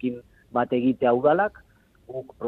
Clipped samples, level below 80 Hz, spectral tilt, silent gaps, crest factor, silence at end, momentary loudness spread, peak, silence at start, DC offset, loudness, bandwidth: under 0.1%; -60 dBFS; -9 dB/octave; none; 16 dB; 0 s; 18 LU; -8 dBFS; 0 s; under 0.1%; -23 LUFS; 4.2 kHz